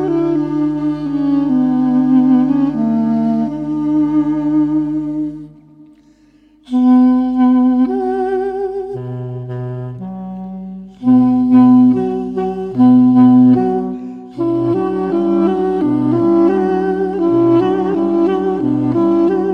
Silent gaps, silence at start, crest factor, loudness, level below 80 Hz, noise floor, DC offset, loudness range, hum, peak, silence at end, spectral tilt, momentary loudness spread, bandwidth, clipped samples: none; 0 s; 12 dB; -14 LUFS; -46 dBFS; -49 dBFS; under 0.1%; 6 LU; 50 Hz at -45 dBFS; -2 dBFS; 0 s; -10 dB/octave; 15 LU; 4.8 kHz; under 0.1%